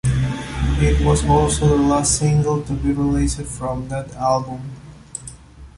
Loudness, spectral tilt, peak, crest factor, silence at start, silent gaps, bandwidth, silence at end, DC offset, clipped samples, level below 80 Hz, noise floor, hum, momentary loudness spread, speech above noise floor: -19 LUFS; -5.5 dB/octave; -2 dBFS; 16 dB; 0.05 s; none; 11.5 kHz; 0.1 s; under 0.1%; under 0.1%; -26 dBFS; -39 dBFS; none; 17 LU; 21 dB